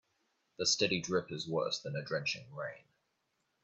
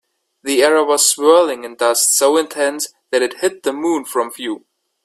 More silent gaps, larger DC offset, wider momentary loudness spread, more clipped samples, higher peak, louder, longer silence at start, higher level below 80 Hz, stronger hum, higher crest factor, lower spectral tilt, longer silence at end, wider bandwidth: neither; neither; about the same, 12 LU vs 12 LU; neither; second, -16 dBFS vs 0 dBFS; second, -35 LUFS vs -15 LUFS; first, 0.6 s vs 0.45 s; second, -74 dBFS vs -66 dBFS; neither; about the same, 20 dB vs 16 dB; first, -3 dB/octave vs -0.5 dB/octave; first, 0.85 s vs 0.5 s; second, 8.4 kHz vs 16 kHz